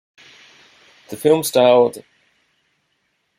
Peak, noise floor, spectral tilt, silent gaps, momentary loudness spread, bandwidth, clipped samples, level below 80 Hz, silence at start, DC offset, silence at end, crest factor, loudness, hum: -2 dBFS; -68 dBFS; -4.5 dB/octave; none; 21 LU; 16.5 kHz; under 0.1%; -66 dBFS; 1.1 s; under 0.1%; 1.4 s; 18 dB; -15 LUFS; none